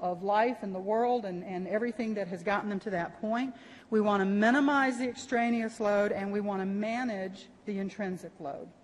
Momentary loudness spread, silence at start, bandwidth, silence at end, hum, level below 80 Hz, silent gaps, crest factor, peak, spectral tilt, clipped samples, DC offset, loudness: 12 LU; 0 s; 11.5 kHz; 0.1 s; none; -70 dBFS; none; 16 dB; -14 dBFS; -6 dB/octave; under 0.1%; under 0.1%; -31 LUFS